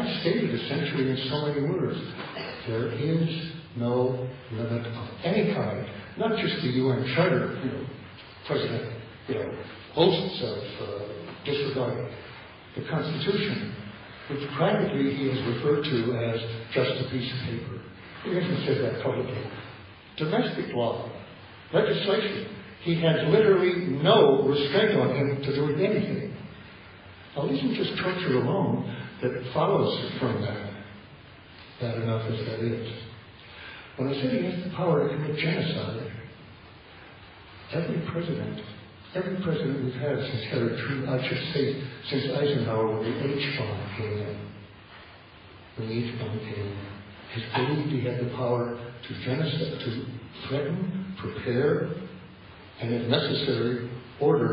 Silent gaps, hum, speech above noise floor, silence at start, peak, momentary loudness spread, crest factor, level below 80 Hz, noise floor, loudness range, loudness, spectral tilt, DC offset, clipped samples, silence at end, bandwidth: none; none; 22 dB; 0 s; -8 dBFS; 19 LU; 20 dB; -60 dBFS; -49 dBFS; 8 LU; -28 LUFS; -11 dB/octave; under 0.1%; under 0.1%; 0 s; 5.6 kHz